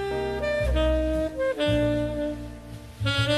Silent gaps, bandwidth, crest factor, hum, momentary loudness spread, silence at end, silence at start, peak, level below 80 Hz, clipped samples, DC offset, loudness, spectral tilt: none; 13.5 kHz; 14 dB; none; 14 LU; 0 s; 0 s; -12 dBFS; -34 dBFS; under 0.1%; under 0.1%; -26 LUFS; -6 dB/octave